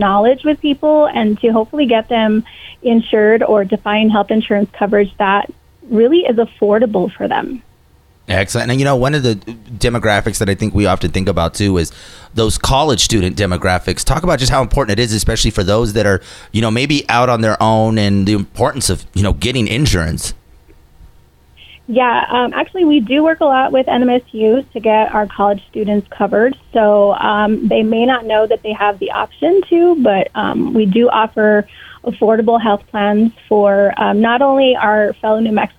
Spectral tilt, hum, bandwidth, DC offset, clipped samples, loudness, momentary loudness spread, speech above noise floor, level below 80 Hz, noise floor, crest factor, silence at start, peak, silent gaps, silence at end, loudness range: -5 dB/octave; none; 15 kHz; under 0.1%; under 0.1%; -14 LUFS; 6 LU; 36 dB; -30 dBFS; -49 dBFS; 12 dB; 0 s; 0 dBFS; none; 0.1 s; 3 LU